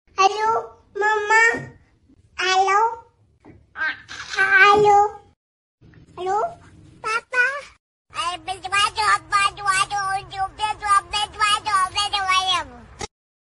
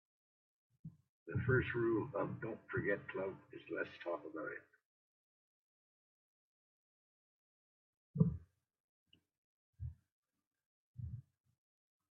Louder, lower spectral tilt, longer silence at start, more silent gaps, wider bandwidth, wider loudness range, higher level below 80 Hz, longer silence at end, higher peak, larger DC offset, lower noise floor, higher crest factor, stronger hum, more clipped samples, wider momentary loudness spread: first, -19 LUFS vs -41 LUFS; second, -1.5 dB/octave vs -7 dB/octave; second, 0.2 s vs 0.85 s; second, 5.36-5.78 s, 7.80-8.05 s vs 1.09-1.26 s, 4.85-8.14 s, 8.80-9.06 s, 9.38-9.73 s, 10.12-10.23 s, 10.47-10.51 s, 10.66-10.94 s; first, 11.5 kHz vs 5.6 kHz; second, 5 LU vs 17 LU; first, -52 dBFS vs -68 dBFS; second, 0.55 s vs 0.9 s; first, 0 dBFS vs -20 dBFS; neither; second, -56 dBFS vs under -90 dBFS; about the same, 22 dB vs 26 dB; neither; neither; second, 17 LU vs 20 LU